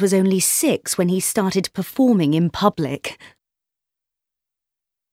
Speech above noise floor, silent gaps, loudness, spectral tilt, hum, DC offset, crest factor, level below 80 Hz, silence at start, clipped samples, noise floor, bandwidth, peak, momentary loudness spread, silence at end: 67 dB; none; -19 LUFS; -4.5 dB/octave; none; under 0.1%; 20 dB; -56 dBFS; 0 s; under 0.1%; -86 dBFS; 16.5 kHz; -2 dBFS; 9 LU; 1.85 s